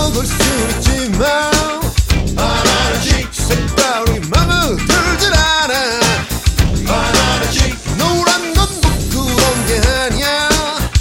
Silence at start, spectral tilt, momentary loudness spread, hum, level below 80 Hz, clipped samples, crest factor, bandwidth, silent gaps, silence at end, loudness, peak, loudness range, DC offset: 0 s; -3.5 dB/octave; 4 LU; none; -20 dBFS; under 0.1%; 14 dB; 17 kHz; none; 0 s; -14 LUFS; 0 dBFS; 1 LU; under 0.1%